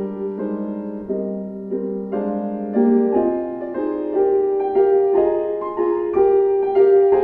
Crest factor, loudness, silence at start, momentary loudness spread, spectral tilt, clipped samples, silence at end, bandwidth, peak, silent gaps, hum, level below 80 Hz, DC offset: 14 dB; -19 LUFS; 0 s; 10 LU; -11 dB/octave; under 0.1%; 0 s; 3 kHz; -4 dBFS; none; none; -54 dBFS; under 0.1%